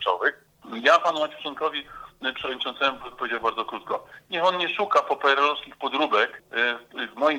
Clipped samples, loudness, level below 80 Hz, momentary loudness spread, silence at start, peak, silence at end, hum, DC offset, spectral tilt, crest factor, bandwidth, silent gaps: under 0.1%; -25 LUFS; -66 dBFS; 12 LU; 0 s; -4 dBFS; 0 s; none; under 0.1%; -3 dB/octave; 22 dB; 16 kHz; none